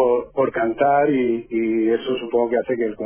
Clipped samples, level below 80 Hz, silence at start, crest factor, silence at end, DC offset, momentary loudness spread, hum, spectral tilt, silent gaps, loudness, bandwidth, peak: under 0.1%; -56 dBFS; 0 s; 14 dB; 0 s; under 0.1%; 5 LU; none; -10 dB/octave; none; -20 LUFS; 3.5 kHz; -6 dBFS